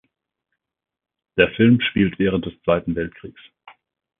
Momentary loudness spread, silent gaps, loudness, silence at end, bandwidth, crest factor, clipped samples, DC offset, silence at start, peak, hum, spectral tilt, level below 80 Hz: 12 LU; none; -19 LUFS; 0.9 s; 3.9 kHz; 22 dB; under 0.1%; under 0.1%; 1.35 s; 0 dBFS; none; -11.5 dB/octave; -46 dBFS